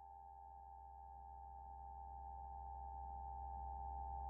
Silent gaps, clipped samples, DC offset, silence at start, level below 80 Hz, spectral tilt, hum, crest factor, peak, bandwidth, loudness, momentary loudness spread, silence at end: none; under 0.1%; under 0.1%; 0 s; -56 dBFS; 0 dB/octave; none; 14 dB; -38 dBFS; 1.8 kHz; -53 LUFS; 9 LU; 0 s